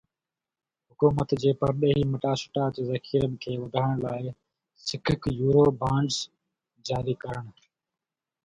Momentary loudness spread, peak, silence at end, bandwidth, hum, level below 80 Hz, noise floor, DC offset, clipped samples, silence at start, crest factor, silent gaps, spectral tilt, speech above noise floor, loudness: 12 LU; -8 dBFS; 0.95 s; 9.4 kHz; none; -52 dBFS; under -90 dBFS; under 0.1%; under 0.1%; 1 s; 20 dB; none; -6.5 dB/octave; over 64 dB; -27 LUFS